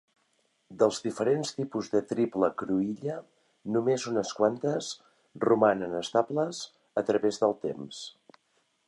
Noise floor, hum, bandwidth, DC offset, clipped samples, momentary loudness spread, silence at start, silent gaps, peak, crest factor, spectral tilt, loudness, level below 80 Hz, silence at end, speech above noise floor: -72 dBFS; none; 11.5 kHz; under 0.1%; under 0.1%; 13 LU; 0.7 s; none; -10 dBFS; 20 dB; -5 dB/octave; -29 LUFS; -72 dBFS; 0.8 s; 44 dB